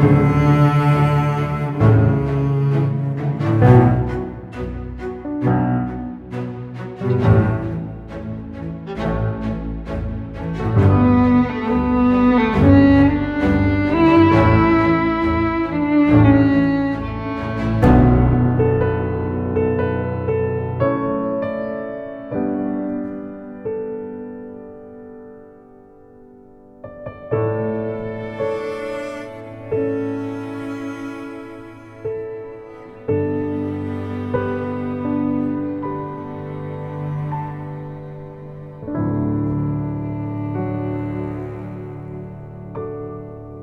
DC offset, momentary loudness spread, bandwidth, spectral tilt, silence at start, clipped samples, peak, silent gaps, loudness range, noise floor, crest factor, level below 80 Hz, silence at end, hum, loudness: under 0.1%; 18 LU; 6.8 kHz; -9.5 dB/octave; 0 s; under 0.1%; 0 dBFS; none; 13 LU; -45 dBFS; 18 dB; -34 dBFS; 0 s; none; -19 LUFS